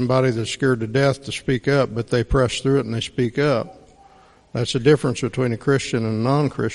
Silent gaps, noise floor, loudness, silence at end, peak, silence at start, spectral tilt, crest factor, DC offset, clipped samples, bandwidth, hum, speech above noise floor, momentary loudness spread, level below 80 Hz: none; -51 dBFS; -21 LUFS; 0 s; -2 dBFS; 0 s; -6 dB/octave; 18 dB; under 0.1%; under 0.1%; 11.5 kHz; none; 31 dB; 5 LU; -40 dBFS